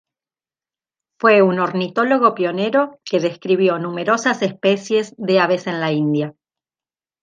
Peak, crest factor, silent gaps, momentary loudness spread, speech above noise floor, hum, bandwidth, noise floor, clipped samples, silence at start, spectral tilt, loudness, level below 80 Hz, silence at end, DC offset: -2 dBFS; 18 dB; none; 7 LU; over 73 dB; none; 9.2 kHz; under -90 dBFS; under 0.1%; 1.25 s; -5.5 dB/octave; -18 LUFS; -72 dBFS; 0.9 s; under 0.1%